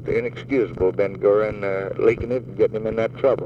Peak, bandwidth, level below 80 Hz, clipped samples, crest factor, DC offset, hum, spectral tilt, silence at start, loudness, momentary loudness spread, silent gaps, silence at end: -4 dBFS; 7 kHz; -46 dBFS; under 0.1%; 16 dB; under 0.1%; none; -8.5 dB/octave; 0 s; -22 LUFS; 6 LU; none; 0 s